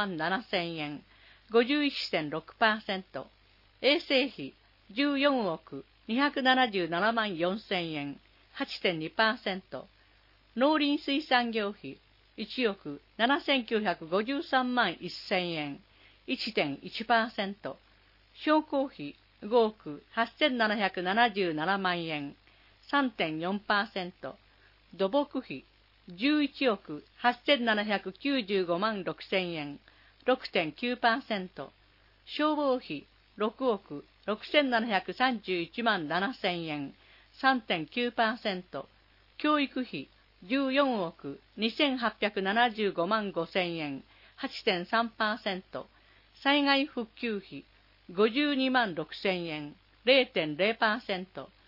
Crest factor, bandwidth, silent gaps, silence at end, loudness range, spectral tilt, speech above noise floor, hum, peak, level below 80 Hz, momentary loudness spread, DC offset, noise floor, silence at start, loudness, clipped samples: 22 dB; 5.8 kHz; none; 0.2 s; 3 LU; -6 dB/octave; 33 dB; none; -10 dBFS; -68 dBFS; 16 LU; under 0.1%; -63 dBFS; 0 s; -30 LUFS; under 0.1%